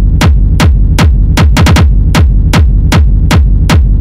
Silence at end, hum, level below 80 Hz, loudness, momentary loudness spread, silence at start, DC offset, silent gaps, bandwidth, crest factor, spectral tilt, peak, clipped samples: 0 s; none; -8 dBFS; -8 LUFS; 2 LU; 0 s; under 0.1%; none; 16 kHz; 4 dB; -6 dB/octave; 0 dBFS; under 0.1%